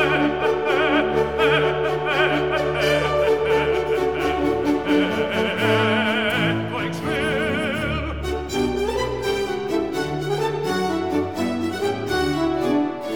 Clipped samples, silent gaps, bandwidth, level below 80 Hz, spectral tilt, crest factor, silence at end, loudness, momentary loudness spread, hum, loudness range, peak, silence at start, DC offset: under 0.1%; none; 19.5 kHz; -40 dBFS; -5.5 dB/octave; 18 dB; 0 s; -21 LUFS; 6 LU; none; 4 LU; -4 dBFS; 0 s; 0.4%